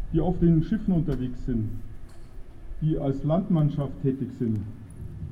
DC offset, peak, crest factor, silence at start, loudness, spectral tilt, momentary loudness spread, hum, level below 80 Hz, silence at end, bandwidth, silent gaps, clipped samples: under 0.1%; -10 dBFS; 16 dB; 0 s; -26 LUFS; -10.5 dB/octave; 19 LU; none; -36 dBFS; 0 s; 5 kHz; none; under 0.1%